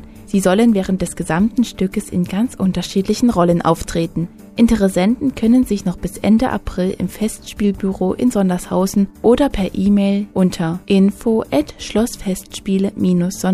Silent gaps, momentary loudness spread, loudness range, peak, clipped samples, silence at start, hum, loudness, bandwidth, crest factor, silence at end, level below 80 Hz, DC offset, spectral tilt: none; 7 LU; 2 LU; 0 dBFS; under 0.1%; 0 s; none; -17 LUFS; 15 kHz; 16 dB; 0 s; -36 dBFS; under 0.1%; -6.5 dB/octave